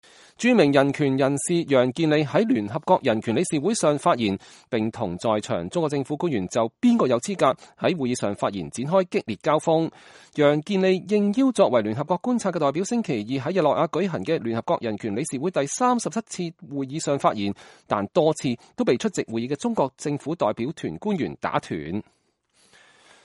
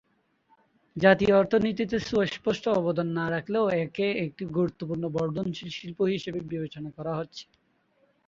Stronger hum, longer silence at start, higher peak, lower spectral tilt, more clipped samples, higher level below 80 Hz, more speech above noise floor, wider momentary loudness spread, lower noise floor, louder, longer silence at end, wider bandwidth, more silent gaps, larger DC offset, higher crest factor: neither; second, 0.4 s vs 0.95 s; about the same, -4 dBFS vs -4 dBFS; about the same, -5.5 dB/octave vs -6.5 dB/octave; neither; about the same, -62 dBFS vs -58 dBFS; about the same, 42 dB vs 41 dB; second, 9 LU vs 14 LU; about the same, -65 dBFS vs -68 dBFS; first, -24 LUFS vs -27 LUFS; first, 1.25 s vs 0.85 s; first, 11.5 kHz vs 7.6 kHz; neither; neither; about the same, 20 dB vs 24 dB